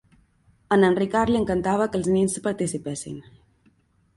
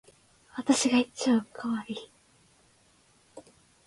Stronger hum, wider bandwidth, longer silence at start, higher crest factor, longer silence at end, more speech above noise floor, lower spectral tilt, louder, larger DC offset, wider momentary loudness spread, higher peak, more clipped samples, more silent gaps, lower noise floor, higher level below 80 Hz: neither; about the same, 11.5 kHz vs 11.5 kHz; first, 0.7 s vs 0.55 s; about the same, 18 dB vs 20 dB; first, 0.95 s vs 0.45 s; first, 40 dB vs 36 dB; first, -5.5 dB/octave vs -3 dB/octave; first, -23 LUFS vs -28 LUFS; neither; second, 13 LU vs 17 LU; about the same, -8 dBFS vs -10 dBFS; neither; neither; about the same, -62 dBFS vs -64 dBFS; first, -50 dBFS vs -70 dBFS